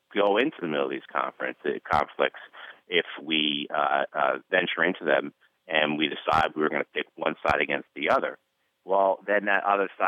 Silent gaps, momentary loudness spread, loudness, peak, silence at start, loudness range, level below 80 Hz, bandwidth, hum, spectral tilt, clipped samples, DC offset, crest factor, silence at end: none; 7 LU; -26 LUFS; -8 dBFS; 0.15 s; 2 LU; -58 dBFS; 11 kHz; none; -5.5 dB/octave; under 0.1%; under 0.1%; 20 dB; 0 s